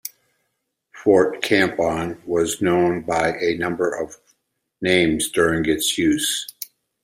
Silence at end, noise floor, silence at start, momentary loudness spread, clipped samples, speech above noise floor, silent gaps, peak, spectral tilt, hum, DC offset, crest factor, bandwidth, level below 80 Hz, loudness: 0.4 s; -75 dBFS; 0.05 s; 10 LU; under 0.1%; 55 dB; none; -2 dBFS; -4 dB/octave; none; under 0.1%; 18 dB; 16 kHz; -52 dBFS; -20 LUFS